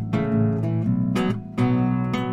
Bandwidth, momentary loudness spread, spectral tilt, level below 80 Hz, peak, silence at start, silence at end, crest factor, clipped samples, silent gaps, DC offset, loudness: 10 kHz; 3 LU; -8.5 dB/octave; -46 dBFS; -8 dBFS; 0 s; 0 s; 14 dB; under 0.1%; none; under 0.1%; -23 LUFS